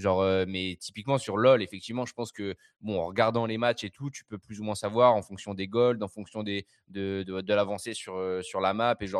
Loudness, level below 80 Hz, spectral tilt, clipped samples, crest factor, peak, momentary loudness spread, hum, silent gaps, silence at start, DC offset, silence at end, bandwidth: -29 LUFS; -66 dBFS; -5.5 dB/octave; under 0.1%; 20 dB; -8 dBFS; 14 LU; none; none; 0 s; under 0.1%; 0 s; 12.5 kHz